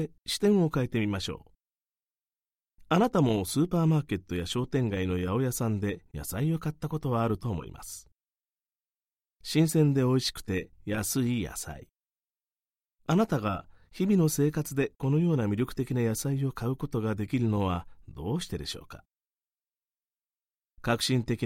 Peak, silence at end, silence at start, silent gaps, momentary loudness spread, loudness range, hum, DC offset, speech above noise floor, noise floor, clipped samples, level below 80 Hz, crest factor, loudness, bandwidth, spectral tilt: -10 dBFS; 0 s; 0 s; none; 13 LU; 6 LU; none; under 0.1%; over 62 dB; under -90 dBFS; under 0.1%; -52 dBFS; 20 dB; -29 LUFS; 16.5 kHz; -6 dB/octave